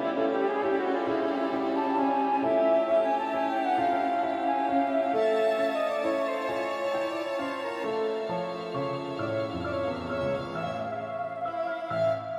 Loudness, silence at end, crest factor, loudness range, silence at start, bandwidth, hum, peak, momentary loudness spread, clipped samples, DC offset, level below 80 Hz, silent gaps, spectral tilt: -28 LUFS; 0 s; 14 dB; 6 LU; 0 s; 13 kHz; none; -14 dBFS; 7 LU; under 0.1%; under 0.1%; -66 dBFS; none; -6.5 dB/octave